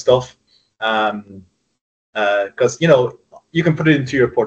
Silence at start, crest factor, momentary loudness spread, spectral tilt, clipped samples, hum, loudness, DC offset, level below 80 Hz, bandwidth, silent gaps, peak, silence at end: 0 s; 18 dB; 10 LU; -6 dB/octave; under 0.1%; none; -17 LUFS; under 0.1%; -52 dBFS; 8.4 kHz; 1.81-2.13 s; 0 dBFS; 0 s